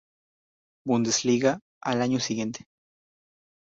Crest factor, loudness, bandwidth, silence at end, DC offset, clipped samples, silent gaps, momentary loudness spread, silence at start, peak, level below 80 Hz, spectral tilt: 20 dB; -26 LUFS; 8 kHz; 1.1 s; under 0.1%; under 0.1%; 1.62-1.81 s; 11 LU; 0.85 s; -8 dBFS; -68 dBFS; -4 dB/octave